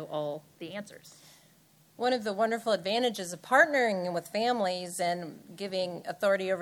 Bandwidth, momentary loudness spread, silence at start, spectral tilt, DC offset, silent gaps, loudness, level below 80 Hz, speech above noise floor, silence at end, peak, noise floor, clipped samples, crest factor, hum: 19 kHz; 17 LU; 0 s; -3.5 dB/octave; under 0.1%; none; -29 LUFS; -82 dBFS; 32 dB; 0 s; -10 dBFS; -62 dBFS; under 0.1%; 20 dB; none